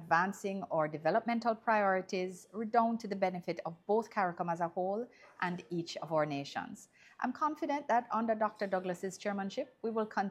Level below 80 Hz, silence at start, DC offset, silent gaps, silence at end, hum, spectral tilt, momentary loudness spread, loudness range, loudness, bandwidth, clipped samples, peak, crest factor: -84 dBFS; 0 s; under 0.1%; none; 0 s; none; -5.5 dB/octave; 9 LU; 4 LU; -35 LUFS; 14.5 kHz; under 0.1%; -14 dBFS; 20 dB